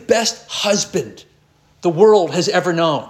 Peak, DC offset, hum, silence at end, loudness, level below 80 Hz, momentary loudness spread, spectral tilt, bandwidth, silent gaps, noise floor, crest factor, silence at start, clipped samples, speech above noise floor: -2 dBFS; under 0.1%; none; 0 s; -16 LUFS; -60 dBFS; 11 LU; -3.5 dB/octave; 13.5 kHz; none; -55 dBFS; 16 dB; 0.1 s; under 0.1%; 39 dB